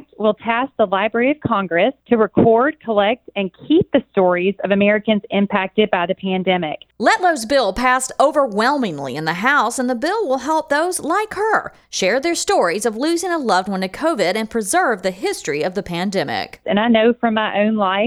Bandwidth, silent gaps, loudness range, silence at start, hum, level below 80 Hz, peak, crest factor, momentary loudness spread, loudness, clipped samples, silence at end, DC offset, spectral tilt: 15.5 kHz; none; 2 LU; 0.2 s; none; -52 dBFS; -2 dBFS; 16 dB; 6 LU; -18 LUFS; under 0.1%; 0 s; under 0.1%; -4.5 dB/octave